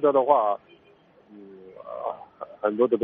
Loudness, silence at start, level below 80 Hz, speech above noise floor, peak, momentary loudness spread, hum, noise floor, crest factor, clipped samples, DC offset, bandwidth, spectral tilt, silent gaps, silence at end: -25 LUFS; 0 s; -76 dBFS; 35 dB; -4 dBFS; 26 LU; none; -57 dBFS; 22 dB; under 0.1%; under 0.1%; 3.8 kHz; -5.5 dB/octave; none; 0 s